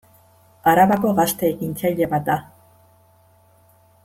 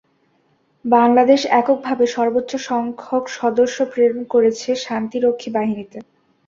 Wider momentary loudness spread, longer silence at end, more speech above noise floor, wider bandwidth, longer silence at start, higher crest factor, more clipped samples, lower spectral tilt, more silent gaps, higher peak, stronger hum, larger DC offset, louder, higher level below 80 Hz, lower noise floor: about the same, 8 LU vs 10 LU; first, 1.6 s vs 0.45 s; second, 37 dB vs 44 dB; first, 16.5 kHz vs 7.6 kHz; second, 0.65 s vs 0.85 s; about the same, 18 dB vs 16 dB; neither; about the same, -5.5 dB/octave vs -4.5 dB/octave; neither; about the same, -4 dBFS vs -2 dBFS; neither; neither; about the same, -19 LUFS vs -18 LUFS; first, -56 dBFS vs -64 dBFS; second, -55 dBFS vs -61 dBFS